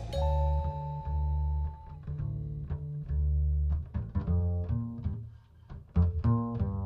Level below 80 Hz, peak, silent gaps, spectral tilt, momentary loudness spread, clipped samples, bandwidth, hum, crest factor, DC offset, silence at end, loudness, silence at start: -34 dBFS; -16 dBFS; none; -10 dB/octave; 9 LU; under 0.1%; 4.6 kHz; none; 16 dB; under 0.1%; 0 s; -33 LUFS; 0 s